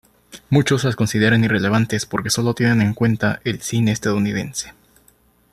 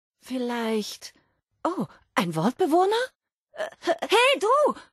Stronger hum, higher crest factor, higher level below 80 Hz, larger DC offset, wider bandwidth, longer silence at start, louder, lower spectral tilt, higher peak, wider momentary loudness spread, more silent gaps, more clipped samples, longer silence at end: neither; about the same, 16 dB vs 18 dB; first, -50 dBFS vs -72 dBFS; neither; about the same, 13.5 kHz vs 12.5 kHz; about the same, 0.35 s vs 0.25 s; first, -19 LUFS vs -24 LUFS; about the same, -5.5 dB/octave vs -4.5 dB/octave; first, -2 dBFS vs -8 dBFS; second, 7 LU vs 16 LU; second, none vs 3.15-3.20 s, 3.33-3.47 s; neither; first, 0.8 s vs 0.1 s